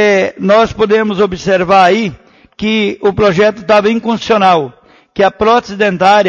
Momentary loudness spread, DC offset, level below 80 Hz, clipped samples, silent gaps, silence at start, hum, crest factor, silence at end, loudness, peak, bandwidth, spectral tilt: 7 LU; under 0.1%; -42 dBFS; under 0.1%; none; 0 s; none; 10 dB; 0 s; -11 LUFS; 0 dBFS; 7.4 kHz; -5.5 dB/octave